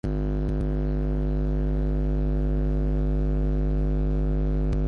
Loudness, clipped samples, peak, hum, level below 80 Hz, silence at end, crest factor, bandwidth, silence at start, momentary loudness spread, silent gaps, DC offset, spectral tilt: -27 LUFS; under 0.1%; -14 dBFS; 50 Hz at -25 dBFS; -26 dBFS; 0 s; 10 dB; 4.2 kHz; 0.05 s; 1 LU; none; under 0.1%; -10.5 dB/octave